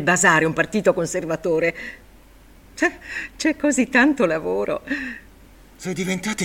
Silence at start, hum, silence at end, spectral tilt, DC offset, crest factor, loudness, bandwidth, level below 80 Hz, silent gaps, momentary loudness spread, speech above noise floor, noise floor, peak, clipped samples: 0 s; none; 0 s; -4 dB/octave; under 0.1%; 20 dB; -21 LUFS; 16.5 kHz; -50 dBFS; none; 16 LU; 27 dB; -48 dBFS; -2 dBFS; under 0.1%